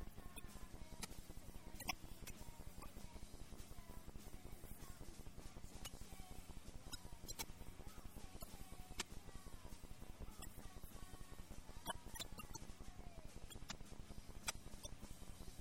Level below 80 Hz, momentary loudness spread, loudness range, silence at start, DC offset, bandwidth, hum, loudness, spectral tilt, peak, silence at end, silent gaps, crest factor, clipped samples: -58 dBFS; 9 LU; 4 LU; 0 s; under 0.1%; 16.5 kHz; none; -55 LUFS; -3 dB/octave; -26 dBFS; 0 s; none; 26 dB; under 0.1%